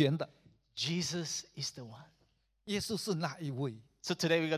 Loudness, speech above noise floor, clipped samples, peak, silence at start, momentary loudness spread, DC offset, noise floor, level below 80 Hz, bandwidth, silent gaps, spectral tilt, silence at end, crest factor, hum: -36 LUFS; 39 dB; under 0.1%; -14 dBFS; 0 s; 17 LU; under 0.1%; -74 dBFS; -70 dBFS; 15.5 kHz; none; -4.5 dB/octave; 0 s; 22 dB; none